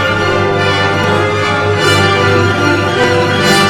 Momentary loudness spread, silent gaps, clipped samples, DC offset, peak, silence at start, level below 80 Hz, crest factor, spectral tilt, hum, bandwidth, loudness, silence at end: 3 LU; none; under 0.1%; 0.6%; 0 dBFS; 0 s; -40 dBFS; 10 dB; -4.5 dB/octave; none; 16 kHz; -11 LUFS; 0 s